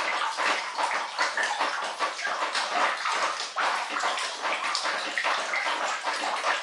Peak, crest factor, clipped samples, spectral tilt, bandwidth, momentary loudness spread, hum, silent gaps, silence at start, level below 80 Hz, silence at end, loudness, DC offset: -8 dBFS; 20 dB; under 0.1%; 1 dB/octave; 11.5 kHz; 3 LU; none; none; 0 s; under -90 dBFS; 0 s; -27 LUFS; under 0.1%